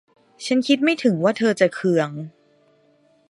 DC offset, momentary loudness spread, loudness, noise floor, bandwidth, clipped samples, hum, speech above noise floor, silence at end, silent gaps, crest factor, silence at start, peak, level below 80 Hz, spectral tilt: under 0.1%; 15 LU; -20 LUFS; -59 dBFS; 11.5 kHz; under 0.1%; none; 40 dB; 1 s; none; 20 dB; 0.4 s; -2 dBFS; -74 dBFS; -5.5 dB/octave